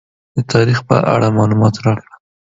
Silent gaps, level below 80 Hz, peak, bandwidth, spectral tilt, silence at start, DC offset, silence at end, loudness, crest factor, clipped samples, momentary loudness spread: none; -46 dBFS; 0 dBFS; 7.8 kHz; -7 dB/octave; 0.35 s; under 0.1%; 0.5 s; -14 LUFS; 14 dB; under 0.1%; 10 LU